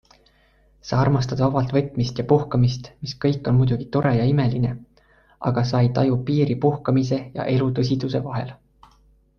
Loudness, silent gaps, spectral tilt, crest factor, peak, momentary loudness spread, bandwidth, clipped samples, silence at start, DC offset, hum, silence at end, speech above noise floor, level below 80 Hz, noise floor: -21 LUFS; none; -8 dB/octave; 18 dB; -4 dBFS; 8 LU; 6.8 kHz; under 0.1%; 0.85 s; under 0.1%; none; 0.85 s; 38 dB; -46 dBFS; -58 dBFS